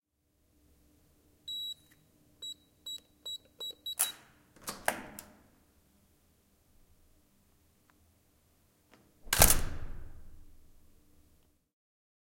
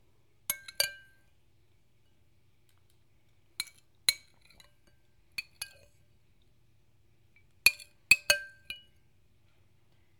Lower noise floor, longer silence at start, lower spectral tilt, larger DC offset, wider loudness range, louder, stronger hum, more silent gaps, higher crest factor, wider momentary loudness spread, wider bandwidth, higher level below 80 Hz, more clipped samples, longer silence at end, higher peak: first, -75 dBFS vs -70 dBFS; first, 1.45 s vs 0.5 s; first, -1.5 dB/octave vs 1.5 dB/octave; neither; second, 12 LU vs 16 LU; second, -32 LUFS vs -29 LUFS; neither; neither; about the same, 34 dB vs 32 dB; first, 25 LU vs 20 LU; second, 16.5 kHz vs 19 kHz; first, -46 dBFS vs -68 dBFS; neither; first, 1.75 s vs 1.45 s; about the same, -4 dBFS vs -6 dBFS